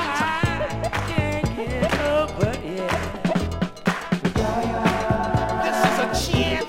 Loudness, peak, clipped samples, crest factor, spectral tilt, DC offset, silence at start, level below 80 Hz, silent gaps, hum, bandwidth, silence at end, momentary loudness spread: -23 LUFS; -6 dBFS; under 0.1%; 16 dB; -5.5 dB/octave; under 0.1%; 0 s; -36 dBFS; none; none; 16 kHz; 0 s; 5 LU